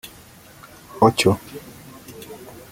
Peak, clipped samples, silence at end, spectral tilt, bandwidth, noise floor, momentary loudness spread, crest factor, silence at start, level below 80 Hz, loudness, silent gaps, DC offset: -2 dBFS; under 0.1%; 0.25 s; -5 dB/octave; 17 kHz; -46 dBFS; 25 LU; 22 dB; 0.95 s; -56 dBFS; -18 LUFS; none; under 0.1%